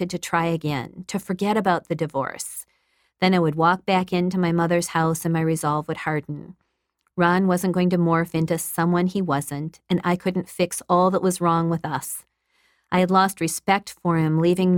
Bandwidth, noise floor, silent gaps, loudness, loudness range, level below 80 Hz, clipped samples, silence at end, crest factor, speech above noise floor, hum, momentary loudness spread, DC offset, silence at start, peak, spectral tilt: 18 kHz; -73 dBFS; none; -22 LUFS; 2 LU; -58 dBFS; under 0.1%; 0 s; 18 dB; 51 dB; none; 10 LU; under 0.1%; 0 s; -4 dBFS; -5.5 dB/octave